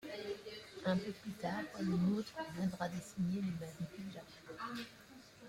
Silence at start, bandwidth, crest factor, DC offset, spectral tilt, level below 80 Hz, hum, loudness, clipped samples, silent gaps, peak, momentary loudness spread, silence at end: 0 s; 16 kHz; 16 dB; under 0.1%; -6.5 dB/octave; -70 dBFS; none; -41 LUFS; under 0.1%; none; -24 dBFS; 14 LU; 0 s